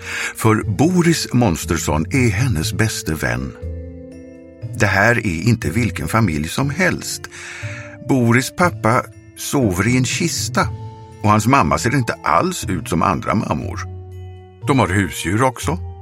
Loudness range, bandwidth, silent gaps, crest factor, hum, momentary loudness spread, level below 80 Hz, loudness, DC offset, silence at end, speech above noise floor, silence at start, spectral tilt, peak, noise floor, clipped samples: 2 LU; 16.5 kHz; none; 18 dB; none; 16 LU; -38 dBFS; -18 LUFS; under 0.1%; 0 s; 21 dB; 0 s; -5 dB/octave; 0 dBFS; -38 dBFS; under 0.1%